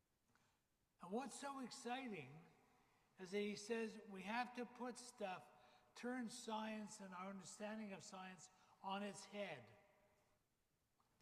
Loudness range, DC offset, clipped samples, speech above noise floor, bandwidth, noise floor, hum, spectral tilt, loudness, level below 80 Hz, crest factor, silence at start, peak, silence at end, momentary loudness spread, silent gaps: 4 LU; under 0.1%; under 0.1%; 36 dB; 15.5 kHz; -87 dBFS; none; -4 dB/octave; -51 LUFS; under -90 dBFS; 20 dB; 1 s; -32 dBFS; 1.35 s; 13 LU; none